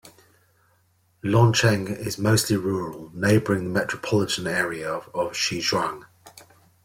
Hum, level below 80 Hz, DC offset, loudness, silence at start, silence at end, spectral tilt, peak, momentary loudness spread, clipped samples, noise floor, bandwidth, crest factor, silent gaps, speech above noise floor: none; -54 dBFS; under 0.1%; -23 LUFS; 0.05 s; 0.4 s; -5 dB/octave; -6 dBFS; 11 LU; under 0.1%; -64 dBFS; 16.5 kHz; 18 dB; none; 41 dB